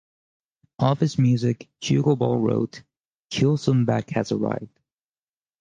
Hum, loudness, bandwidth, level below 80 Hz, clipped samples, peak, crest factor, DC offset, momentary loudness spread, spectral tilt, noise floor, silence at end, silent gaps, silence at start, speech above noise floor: none; -23 LUFS; 8.8 kHz; -60 dBFS; under 0.1%; -6 dBFS; 18 dB; under 0.1%; 8 LU; -7 dB/octave; under -90 dBFS; 0.95 s; 3.00-3.30 s; 0.8 s; over 68 dB